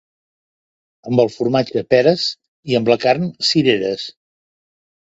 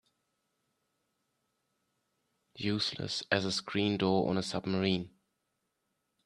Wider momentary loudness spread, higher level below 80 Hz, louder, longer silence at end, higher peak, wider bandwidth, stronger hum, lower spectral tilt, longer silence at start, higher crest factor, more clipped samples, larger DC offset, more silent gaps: about the same, 9 LU vs 7 LU; first, -58 dBFS vs -70 dBFS; first, -17 LUFS vs -32 LUFS; about the same, 1.05 s vs 1.15 s; first, 0 dBFS vs -12 dBFS; second, 8 kHz vs 11 kHz; neither; about the same, -5.5 dB/octave vs -5 dB/octave; second, 1.05 s vs 2.55 s; second, 18 dB vs 24 dB; neither; neither; first, 2.48-2.63 s vs none